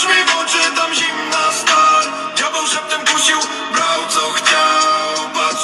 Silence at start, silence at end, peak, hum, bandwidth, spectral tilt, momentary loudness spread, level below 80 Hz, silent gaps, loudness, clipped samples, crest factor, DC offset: 0 s; 0 s; 0 dBFS; none; 14 kHz; 0.5 dB/octave; 6 LU; -70 dBFS; none; -14 LUFS; under 0.1%; 14 dB; under 0.1%